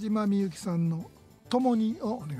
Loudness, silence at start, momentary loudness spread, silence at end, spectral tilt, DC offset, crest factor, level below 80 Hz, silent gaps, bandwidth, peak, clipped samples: -29 LUFS; 0 s; 8 LU; 0 s; -7.5 dB/octave; under 0.1%; 16 dB; -64 dBFS; none; 13 kHz; -14 dBFS; under 0.1%